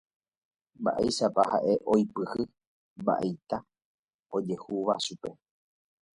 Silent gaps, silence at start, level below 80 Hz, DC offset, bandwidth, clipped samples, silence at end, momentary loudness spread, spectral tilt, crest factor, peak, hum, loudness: 2.67-2.96 s, 3.85-4.08 s, 4.14-4.19 s; 0.8 s; -64 dBFS; under 0.1%; 11.5 kHz; under 0.1%; 0.8 s; 11 LU; -5.5 dB/octave; 22 dB; -10 dBFS; none; -29 LUFS